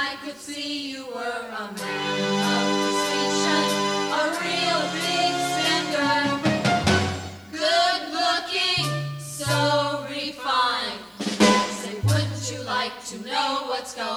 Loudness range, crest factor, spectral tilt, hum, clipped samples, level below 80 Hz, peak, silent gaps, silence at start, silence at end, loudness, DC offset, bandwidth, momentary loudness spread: 2 LU; 20 dB; -3.5 dB/octave; none; under 0.1%; -56 dBFS; -4 dBFS; none; 0 s; 0 s; -23 LUFS; under 0.1%; over 20 kHz; 10 LU